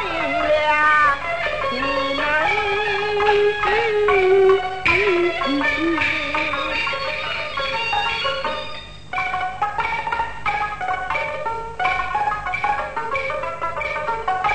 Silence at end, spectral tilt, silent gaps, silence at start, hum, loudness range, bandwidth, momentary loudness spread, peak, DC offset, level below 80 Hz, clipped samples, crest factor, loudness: 0 s; -4.5 dB/octave; none; 0 s; 50 Hz at -45 dBFS; 6 LU; 9 kHz; 9 LU; -4 dBFS; 1%; -44 dBFS; under 0.1%; 16 dB; -20 LUFS